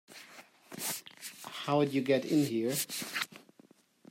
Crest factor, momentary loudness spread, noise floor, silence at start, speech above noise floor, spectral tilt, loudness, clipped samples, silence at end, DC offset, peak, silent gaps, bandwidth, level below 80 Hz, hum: 18 dB; 20 LU; -63 dBFS; 0.1 s; 33 dB; -4 dB/octave; -33 LUFS; under 0.1%; 0.75 s; under 0.1%; -16 dBFS; none; 16 kHz; -80 dBFS; none